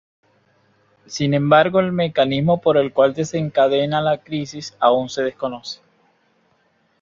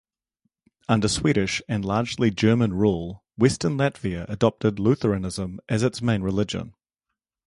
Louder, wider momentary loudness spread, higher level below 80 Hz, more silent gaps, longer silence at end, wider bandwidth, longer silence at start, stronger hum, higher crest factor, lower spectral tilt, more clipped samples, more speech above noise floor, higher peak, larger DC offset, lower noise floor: first, -18 LUFS vs -24 LUFS; first, 13 LU vs 10 LU; second, -58 dBFS vs -46 dBFS; neither; first, 1.25 s vs 0.8 s; second, 7.6 kHz vs 11.5 kHz; first, 1.1 s vs 0.9 s; neither; about the same, 18 dB vs 20 dB; about the same, -6 dB/octave vs -6 dB/octave; neither; second, 44 dB vs 62 dB; about the same, -2 dBFS vs -4 dBFS; neither; second, -62 dBFS vs -84 dBFS